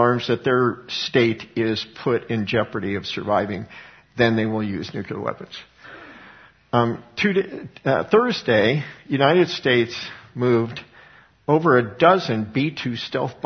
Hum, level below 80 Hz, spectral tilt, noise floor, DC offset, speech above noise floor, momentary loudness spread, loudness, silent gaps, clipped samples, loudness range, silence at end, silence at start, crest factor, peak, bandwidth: none; -58 dBFS; -6.5 dB/octave; -50 dBFS; under 0.1%; 29 dB; 15 LU; -21 LUFS; none; under 0.1%; 6 LU; 0.1 s; 0 s; 20 dB; 0 dBFS; 6.6 kHz